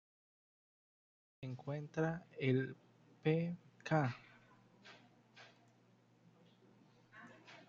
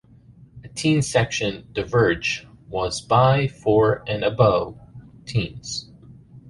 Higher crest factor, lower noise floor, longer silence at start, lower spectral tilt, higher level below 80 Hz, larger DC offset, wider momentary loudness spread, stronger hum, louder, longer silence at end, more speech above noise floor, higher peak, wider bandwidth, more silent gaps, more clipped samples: about the same, 22 dB vs 20 dB; first, -70 dBFS vs -49 dBFS; first, 1.4 s vs 0.55 s; about the same, -6.5 dB/octave vs -5.5 dB/octave; second, -80 dBFS vs -46 dBFS; neither; first, 24 LU vs 13 LU; first, 60 Hz at -65 dBFS vs none; second, -40 LUFS vs -21 LUFS; about the same, 0.05 s vs 0 s; first, 32 dB vs 28 dB; second, -20 dBFS vs -4 dBFS; second, 7.2 kHz vs 11.5 kHz; neither; neither